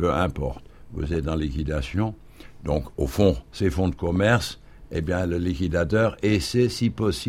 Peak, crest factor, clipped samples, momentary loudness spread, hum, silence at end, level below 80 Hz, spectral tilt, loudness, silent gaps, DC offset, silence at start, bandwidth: -6 dBFS; 18 dB; under 0.1%; 12 LU; none; 0 s; -36 dBFS; -6.5 dB/octave; -25 LUFS; none; under 0.1%; 0 s; 16 kHz